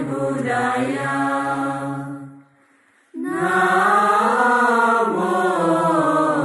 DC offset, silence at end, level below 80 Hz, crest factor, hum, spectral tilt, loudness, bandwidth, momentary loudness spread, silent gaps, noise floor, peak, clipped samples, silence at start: under 0.1%; 0 s; -64 dBFS; 14 dB; none; -5.5 dB/octave; -18 LUFS; 12 kHz; 12 LU; none; -57 dBFS; -4 dBFS; under 0.1%; 0 s